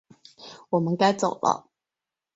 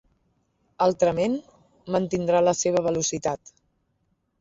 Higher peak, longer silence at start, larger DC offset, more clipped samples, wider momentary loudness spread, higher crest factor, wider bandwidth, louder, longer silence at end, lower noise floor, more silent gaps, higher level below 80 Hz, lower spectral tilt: about the same, -6 dBFS vs -8 dBFS; second, 0.4 s vs 0.8 s; neither; neither; first, 23 LU vs 9 LU; about the same, 20 dB vs 18 dB; about the same, 8 kHz vs 8 kHz; about the same, -24 LUFS vs -24 LUFS; second, 0.75 s vs 1.05 s; first, -89 dBFS vs -72 dBFS; neither; second, -70 dBFS vs -58 dBFS; about the same, -5.5 dB/octave vs -4.5 dB/octave